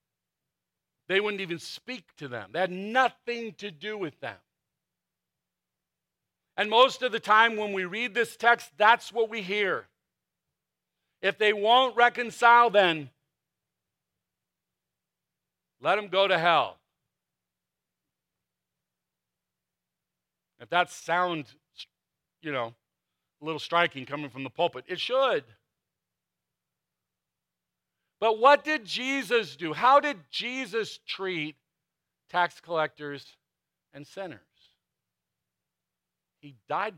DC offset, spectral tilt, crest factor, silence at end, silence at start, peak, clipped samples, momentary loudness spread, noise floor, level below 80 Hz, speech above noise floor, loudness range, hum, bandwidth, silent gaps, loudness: under 0.1%; -3.5 dB/octave; 24 dB; 0.05 s; 1.1 s; -6 dBFS; under 0.1%; 17 LU; -88 dBFS; -82 dBFS; 61 dB; 11 LU; none; 16 kHz; none; -26 LUFS